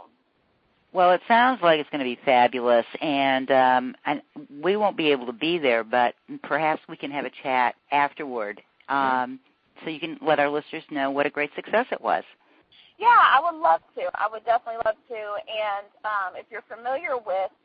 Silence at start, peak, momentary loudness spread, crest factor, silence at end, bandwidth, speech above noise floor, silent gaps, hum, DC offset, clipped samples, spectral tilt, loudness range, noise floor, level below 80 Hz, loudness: 0.95 s; -4 dBFS; 13 LU; 20 dB; 0.15 s; 5 kHz; 44 dB; none; none; under 0.1%; under 0.1%; -8.5 dB/octave; 5 LU; -67 dBFS; -70 dBFS; -23 LUFS